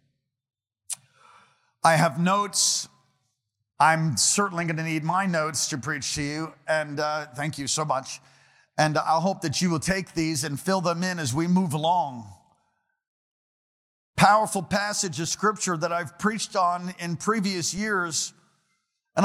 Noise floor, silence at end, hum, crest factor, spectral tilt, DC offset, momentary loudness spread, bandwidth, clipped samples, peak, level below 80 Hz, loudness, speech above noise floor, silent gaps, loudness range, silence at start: -77 dBFS; 0 s; none; 22 dB; -3.5 dB/octave; under 0.1%; 11 LU; 16 kHz; under 0.1%; -4 dBFS; -58 dBFS; -25 LUFS; 52 dB; 13.08-14.14 s; 4 LU; 0.9 s